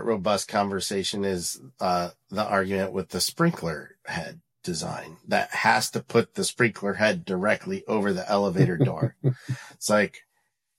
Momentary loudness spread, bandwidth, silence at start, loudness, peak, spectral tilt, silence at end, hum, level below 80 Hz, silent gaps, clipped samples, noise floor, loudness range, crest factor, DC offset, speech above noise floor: 11 LU; 16.5 kHz; 0 s; -26 LUFS; -6 dBFS; -4.5 dB/octave; 0.6 s; none; -62 dBFS; none; under 0.1%; -75 dBFS; 3 LU; 20 dB; under 0.1%; 49 dB